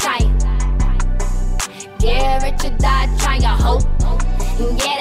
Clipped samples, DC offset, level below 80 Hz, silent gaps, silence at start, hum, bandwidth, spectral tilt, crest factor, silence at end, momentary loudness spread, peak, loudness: under 0.1%; under 0.1%; -16 dBFS; none; 0 s; none; 15 kHz; -4.5 dB/octave; 10 dB; 0 s; 6 LU; -4 dBFS; -19 LUFS